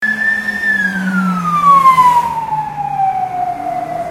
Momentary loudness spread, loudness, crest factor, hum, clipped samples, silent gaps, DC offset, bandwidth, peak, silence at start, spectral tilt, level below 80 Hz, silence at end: 12 LU; -13 LUFS; 14 dB; none; under 0.1%; none; under 0.1%; 16.5 kHz; 0 dBFS; 0 s; -5.5 dB/octave; -50 dBFS; 0 s